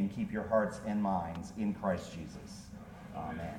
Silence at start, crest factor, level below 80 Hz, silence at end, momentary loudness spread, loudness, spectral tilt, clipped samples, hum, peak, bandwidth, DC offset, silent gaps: 0 s; 18 dB; -56 dBFS; 0 s; 16 LU; -36 LUFS; -7 dB/octave; under 0.1%; none; -18 dBFS; 13.5 kHz; under 0.1%; none